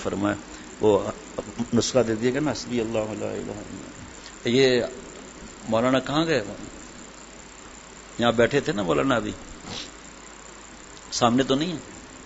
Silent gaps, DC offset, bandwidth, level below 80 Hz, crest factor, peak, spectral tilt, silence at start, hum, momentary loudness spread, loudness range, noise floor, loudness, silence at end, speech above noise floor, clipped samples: none; under 0.1%; 8 kHz; -50 dBFS; 22 dB; -4 dBFS; -4.5 dB/octave; 0 s; none; 21 LU; 2 LU; -44 dBFS; -24 LUFS; 0 s; 20 dB; under 0.1%